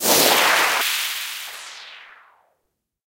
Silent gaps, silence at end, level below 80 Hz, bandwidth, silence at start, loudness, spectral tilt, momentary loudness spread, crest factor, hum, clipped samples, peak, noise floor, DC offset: none; 1.05 s; -64 dBFS; 16 kHz; 0 s; -17 LUFS; 0 dB/octave; 22 LU; 20 dB; none; under 0.1%; -2 dBFS; -75 dBFS; under 0.1%